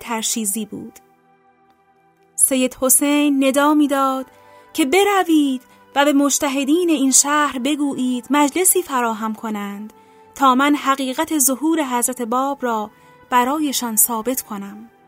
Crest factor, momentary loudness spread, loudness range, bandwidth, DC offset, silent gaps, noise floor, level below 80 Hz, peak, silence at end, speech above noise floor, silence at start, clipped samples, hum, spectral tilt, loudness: 18 dB; 13 LU; 3 LU; 16.5 kHz; under 0.1%; none; -57 dBFS; -62 dBFS; 0 dBFS; 0.2 s; 39 dB; 0 s; under 0.1%; none; -2 dB/octave; -17 LUFS